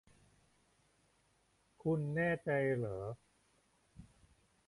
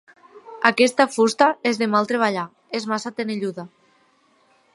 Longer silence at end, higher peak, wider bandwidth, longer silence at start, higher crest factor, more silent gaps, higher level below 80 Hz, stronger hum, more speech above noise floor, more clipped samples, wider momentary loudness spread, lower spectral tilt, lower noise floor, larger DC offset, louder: second, 0.65 s vs 1.1 s; second, -24 dBFS vs 0 dBFS; about the same, 11.5 kHz vs 11.5 kHz; first, 1.85 s vs 0.35 s; about the same, 18 dB vs 22 dB; neither; about the same, -68 dBFS vs -72 dBFS; neither; about the same, 39 dB vs 40 dB; neither; about the same, 11 LU vs 12 LU; first, -8.5 dB/octave vs -4 dB/octave; first, -75 dBFS vs -60 dBFS; neither; second, -37 LUFS vs -20 LUFS